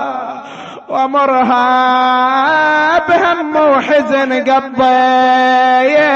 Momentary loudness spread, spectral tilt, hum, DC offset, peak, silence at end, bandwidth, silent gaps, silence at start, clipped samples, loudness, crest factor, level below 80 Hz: 11 LU; -4.5 dB/octave; none; under 0.1%; -2 dBFS; 0 s; 7.6 kHz; none; 0 s; under 0.1%; -11 LUFS; 10 dB; -54 dBFS